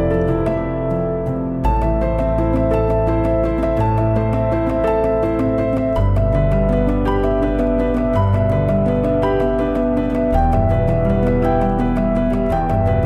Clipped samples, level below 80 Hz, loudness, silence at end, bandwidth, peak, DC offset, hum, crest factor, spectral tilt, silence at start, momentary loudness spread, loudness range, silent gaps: under 0.1%; -24 dBFS; -18 LUFS; 0 s; 5.8 kHz; -4 dBFS; under 0.1%; none; 12 dB; -10 dB/octave; 0 s; 2 LU; 1 LU; none